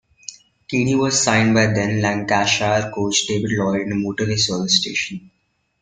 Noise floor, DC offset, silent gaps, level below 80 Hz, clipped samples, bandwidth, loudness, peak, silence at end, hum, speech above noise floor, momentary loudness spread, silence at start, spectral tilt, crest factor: -40 dBFS; under 0.1%; none; -52 dBFS; under 0.1%; 9.6 kHz; -18 LUFS; -2 dBFS; 0.65 s; none; 22 dB; 9 LU; 0.3 s; -3.5 dB/octave; 18 dB